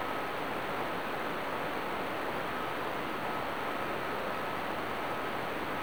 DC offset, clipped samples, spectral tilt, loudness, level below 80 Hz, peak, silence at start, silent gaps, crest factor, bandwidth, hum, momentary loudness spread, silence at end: 0.6%; under 0.1%; -4.5 dB/octave; -35 LUFS; -62 dBFS; -18 dBFS; 0 s; none; 16 dB; over 20 kHz; none; 0 LU; 0 s